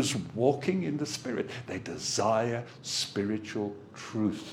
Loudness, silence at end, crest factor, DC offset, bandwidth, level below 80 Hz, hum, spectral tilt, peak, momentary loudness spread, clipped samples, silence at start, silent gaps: -31 LUFS; 0 s; 20 dB; under 0.1%; 16.5 kHz; -68 dBFS; none; -4.5 dB/octave; -12 dBFS; 10 LU; under 0.1%; 0 s; none